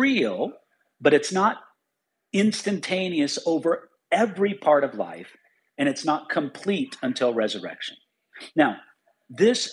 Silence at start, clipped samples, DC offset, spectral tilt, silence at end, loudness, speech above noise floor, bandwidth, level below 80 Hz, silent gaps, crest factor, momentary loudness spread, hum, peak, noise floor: 0 s; under 0.1%; under 0.1%; -4.5 dB/octave; 0 s; -24 LUFS; 56 dB; 11.5 kHz; -78 dBFS; none; 20 dB; 13 LU; none; -4 dBFS; -80 dBFS